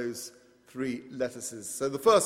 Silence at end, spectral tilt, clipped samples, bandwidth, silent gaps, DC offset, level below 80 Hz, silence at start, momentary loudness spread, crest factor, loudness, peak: 0 s; -3.5 dB/octave; under 0.1%; 16 kHz; none; under 0.1%; -68 dBFS; 0 s; 15 LU; 20 dB; -32 LUFS; -10 dBFS